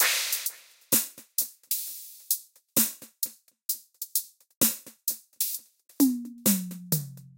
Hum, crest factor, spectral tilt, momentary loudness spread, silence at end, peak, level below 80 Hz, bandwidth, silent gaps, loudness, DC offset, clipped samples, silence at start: none; 22 dB; -2 dB/octave; 9 LU; 0.1 s; -8 dBFS; -72 dBFS; 17 kHz; 4.56-4.61 s; -28 LUFS; under 0.1%; under 0.1%; 0 s